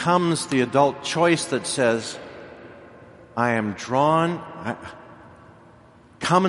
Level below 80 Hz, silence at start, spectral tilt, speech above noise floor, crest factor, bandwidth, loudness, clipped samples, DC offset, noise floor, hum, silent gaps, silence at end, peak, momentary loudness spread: -62 dBFS; 0 s; -5 dB/octave; 29 dB; 20 dB; 11.5 kHz; -22 LUFS; under 0.1%; under 0.1%; -51 dBFS; none; none; 0 s; -4 dBFS; 21 LU